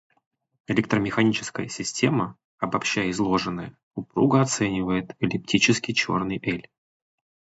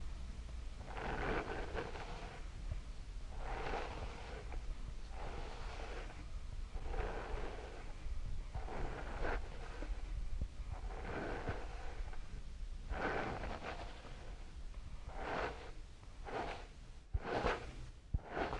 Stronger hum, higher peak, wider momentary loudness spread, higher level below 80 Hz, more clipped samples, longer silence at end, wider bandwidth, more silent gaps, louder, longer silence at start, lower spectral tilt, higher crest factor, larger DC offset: neither; first, -4 dBFS vs -22 dBFS; about the same, 11 LU vs 12 LU; second, -54 dBFS vs -46 dBFS; neither; first, 0.95 s vs 0 s; second, 8 kHz vs 10.5 kHz; first, 2.44-2.58 s, 3.83-3.91 s vs none; first, -24 LUFS vs -46 LUFS; first, 0.7 s vs 0 s; about the same, -4.5 dB/octave vs -5.5 dB/octave; about the same, 20 dB vs 20 dB; neither